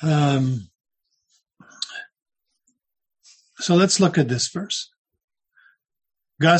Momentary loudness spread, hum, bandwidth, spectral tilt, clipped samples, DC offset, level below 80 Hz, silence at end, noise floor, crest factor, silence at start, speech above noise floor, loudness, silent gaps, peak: 15 LU; none; 9.4 kHz; -5 dB/octave; under 0.1%; under 0.1%; -62 dBFS; 0 s; -71 dBFS; 20 dB; 0 s; 51 dB; -21 LUFS; 2.22-2.26 s, 4.98-5.05 s, 5.24-5.28 s; -4 dBFS